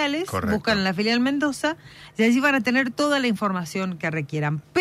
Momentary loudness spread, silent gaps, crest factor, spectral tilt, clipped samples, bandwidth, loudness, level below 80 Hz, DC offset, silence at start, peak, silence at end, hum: 8 LU; none; 14 dB; -5 dB/octave; under 0.1%; 15 kHz; -23 LUFS; -54 dBFS; under 0.1%; 0 s; -10 dBFS; 0 s; none